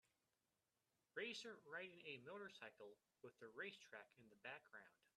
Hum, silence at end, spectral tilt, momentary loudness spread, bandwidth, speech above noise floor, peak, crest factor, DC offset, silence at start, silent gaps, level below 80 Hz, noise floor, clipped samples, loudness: none; 0.1 s; -3 dB/octave; 14 LU; 12.5 kHz; over 31 dB; -38 dBFS; 22 dB; under 0.1%; 1.15 s; none; under -90 dBFS; under -90 dBFS; under 0.1%; -57 LUFS